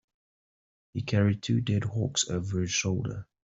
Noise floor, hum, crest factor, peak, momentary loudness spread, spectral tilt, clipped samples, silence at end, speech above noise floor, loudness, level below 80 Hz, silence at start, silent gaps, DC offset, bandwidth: under -90 dBFS; none; 16 dB; -14 dBFS; 9 LU; -4.5 dB/octave; under 0.1%; 0.25 s; over 62 dB; -29 LUFS; -58 dBFS; 0.95 s; none; under 0.1%; 8.2 kHz